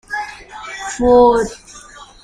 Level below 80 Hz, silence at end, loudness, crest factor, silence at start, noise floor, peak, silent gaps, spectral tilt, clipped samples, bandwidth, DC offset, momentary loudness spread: -38 dBFS; 0.2 s; -14 LUFS; 14 dB; 0.1 s; -39 dBFS; -2 dBFS; none; -4.5 dB/octave; under 0.1%; 11 kHz; under 0.1%; 23 LU